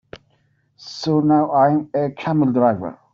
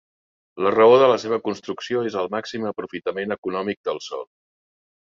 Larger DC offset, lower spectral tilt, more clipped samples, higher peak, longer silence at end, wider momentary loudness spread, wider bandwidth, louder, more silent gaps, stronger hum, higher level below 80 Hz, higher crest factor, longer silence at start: neither; first, -8 dB/octave vs -5.5 dB/octave; neither; about the same, -4 dBFS vs -4 dBFS; second, 0.2 s vs 0.8 s; second, 11 LU vs 15 LU; about the same, 7.2 kHz vs 7.4 kHz; first, -18 LUFS vs -21 LUFS; second, none vs 3.38-3.43 s, 3.77-3.84 s; neither; first, -60 dBFS vs -66 dBFS; about the same, 16 dB vs 18 dB; second, 0.15 s vs 0.55 s